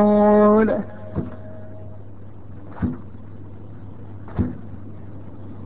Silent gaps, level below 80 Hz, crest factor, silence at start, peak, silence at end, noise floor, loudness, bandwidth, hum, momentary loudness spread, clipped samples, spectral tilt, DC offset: none; -42 dBFS; 16 dB; 0 s; -6 dBFS; 0 s; -40 dBFS; -20 LUFS; 4 kHz; none; 26 LU; under 0.1%; -12.5 dB/octave; 2%